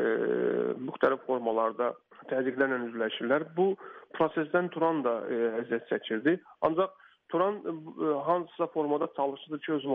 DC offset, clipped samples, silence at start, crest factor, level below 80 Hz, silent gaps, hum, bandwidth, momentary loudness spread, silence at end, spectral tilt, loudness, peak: under 0.1%; under 0.1%; 0 s; 18 dB; -76 dBFS; none; none; 4.4 kHz; 6 LU; 0 s; -4 dB/octave; -30 LUFS; -12 dBFS